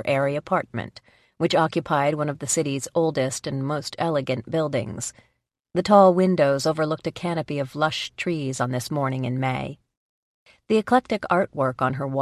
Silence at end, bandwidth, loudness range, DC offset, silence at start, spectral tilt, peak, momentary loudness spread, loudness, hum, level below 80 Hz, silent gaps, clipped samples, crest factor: 0 s; 13.5 kHz; 5 LU; under 0.1%; 0 s; -5 dB/octave; -2 dBFS; 9 LU; -23 LUFS; none; -58 dBFS; 9.97-10.46 s; under 0.1%; 20 dB